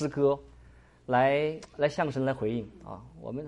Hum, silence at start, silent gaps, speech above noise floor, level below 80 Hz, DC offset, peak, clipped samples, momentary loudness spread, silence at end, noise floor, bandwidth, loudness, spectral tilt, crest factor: none; 0 s; none; 26 dB; -58 dBFS; under 0.1%; -12 dBFS; under 0.1%; 19 LU; 0 s; -55 dBFS; 11 kHz; -29 LUFS; -7 dB/octave; 16 dB